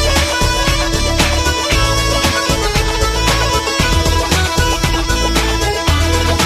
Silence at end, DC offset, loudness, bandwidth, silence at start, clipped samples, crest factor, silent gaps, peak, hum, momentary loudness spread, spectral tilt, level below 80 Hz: 0 s; under 0.1%; -14 LUFS; 16 kHz; 0 s; under 0.1%; 14 dB; none; 0 dBFS; none; 2 LU; -3.5 dB/octave; -18 dBFS